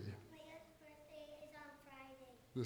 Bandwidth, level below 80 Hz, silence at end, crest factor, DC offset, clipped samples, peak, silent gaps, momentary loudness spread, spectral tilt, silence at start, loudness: over 20 kHz; -76 dBFS; 0 s; 22 dB; under 0.1%; under 0.1%; -32 dBFS; none; 8 LU; -6.5 dB/octave; 0 s; -57 LUFS